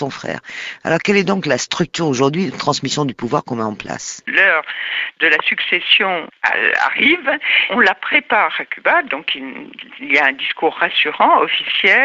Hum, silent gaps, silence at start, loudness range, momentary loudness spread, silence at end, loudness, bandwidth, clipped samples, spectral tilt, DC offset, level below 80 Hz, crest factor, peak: none; none; 0 s; 4 LU; 12 LU; 0 s; -15 LUFS; 8 kHz; under 0.1%; -3.5 dB/octave; under 0.1%; -58 dBFS; 16 dB; 0 dBFS